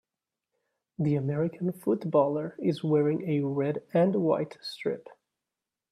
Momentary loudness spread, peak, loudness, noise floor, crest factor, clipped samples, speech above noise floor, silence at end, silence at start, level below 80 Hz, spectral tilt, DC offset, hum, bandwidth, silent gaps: 9 LU; -12 dBFS; -28 LUFS; -89 dBFS; 18 dB; under 0.1%; 62 dB; 0.8 s; 1 s; -72 dBFS; -8.5 dB/octave; under 0.1%; none; 13.5 kHz; none